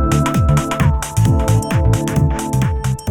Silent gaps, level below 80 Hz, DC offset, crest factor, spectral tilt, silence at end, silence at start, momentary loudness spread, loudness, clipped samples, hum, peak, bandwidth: none; -22 dBFS; 0.2%; 12 dB; -6.5 dB/octave; 0 s; 0 s; 3 LU; -16 LUFS; under 0.1%; none; -2 dBFS; 18 kHz